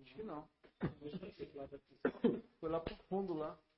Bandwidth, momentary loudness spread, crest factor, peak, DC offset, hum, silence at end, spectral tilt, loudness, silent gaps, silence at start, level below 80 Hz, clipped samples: 5.6 kHz; 13 LU; 22 dB; -20 dBFS; under 0.1%; none; 0.2 s; -6.5 dB/octave; -43 LUFS; none; 0 s; -64 dBFS; under 0.1%